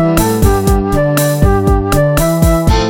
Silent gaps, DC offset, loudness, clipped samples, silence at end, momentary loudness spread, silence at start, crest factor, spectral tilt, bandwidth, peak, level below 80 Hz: none; under 0.1%; -12 LUFS; under 0.1%; 0 s; 2 LU; 0 s; 10 dB; -6 dB/octave; 17 kHz; 0 dBFS; -16 dBFS